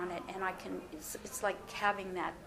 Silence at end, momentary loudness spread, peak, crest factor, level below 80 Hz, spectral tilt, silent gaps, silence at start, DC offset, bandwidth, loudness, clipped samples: 0 s; 9 LU; -16 dBFS; 22 dB; -62 dBFS; -3 dB/octave; none; 0 s; under 0.1%; 15.5 kHz; -38 LUFS; under 0.1%